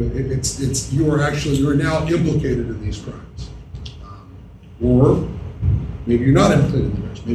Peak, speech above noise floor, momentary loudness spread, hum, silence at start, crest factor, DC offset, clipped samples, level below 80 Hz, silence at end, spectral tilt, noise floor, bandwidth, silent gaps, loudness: 0 dBFS; 22 dB; 20 LU; none; 0 s; 18 dB; under 0.1%; under 0.1%; -32 dBFS; 0 s; -6.5 dB/octave; -39 dBFS; 13.5 kHz; none; -18 LUFS